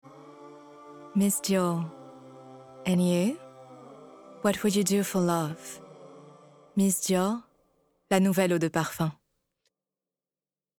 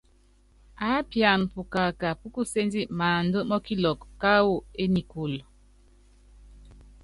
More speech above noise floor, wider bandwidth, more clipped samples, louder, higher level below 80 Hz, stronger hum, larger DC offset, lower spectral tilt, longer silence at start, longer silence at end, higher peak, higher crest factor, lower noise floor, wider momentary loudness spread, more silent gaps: first, over 64 dB vs 34 dB; first, 19.5 kHz vs 11.5 kHz; neither; about the same, -27 LUFS vs -26 LUFS; second, -68 dBFS vs -50 dBFS; second, none vs 50 Hz at -50 dBFS; neither; about the same, -5 dB/octave vs -5.5 dB/octave; second, 0.15 s vs 0.8 s; first, 1.65 s vs 0.2 s; about the same, -8 dBFS vs -6 dBFS; about the same, 22 dB vs 22 dB; first, under -90 dBFS vs -60 dBFS; first, 24 LU vs 10 LU; neither